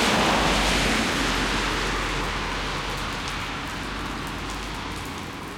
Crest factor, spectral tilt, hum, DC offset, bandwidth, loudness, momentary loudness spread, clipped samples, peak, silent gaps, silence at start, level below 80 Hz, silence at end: 18 dB; -3 dB/octave; none; under 0.1%; 17 kHz; -25 LUFS; 11 LU; under 0.1%; -8 dBFS; none; 0 s; -36 dBFS; 0 s